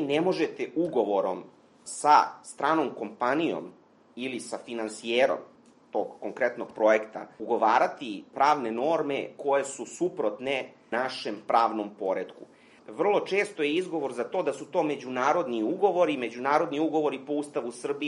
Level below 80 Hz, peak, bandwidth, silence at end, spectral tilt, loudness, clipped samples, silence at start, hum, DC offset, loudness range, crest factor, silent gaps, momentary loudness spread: -80 dBFS; -6 dBFS; 11.5 kHz; 0 s; -4.5 dB/octave; -28 LUFS; under 0.1%; 0 s; none; under 0.1%; 3 LU; 22 dB; none; 11 LU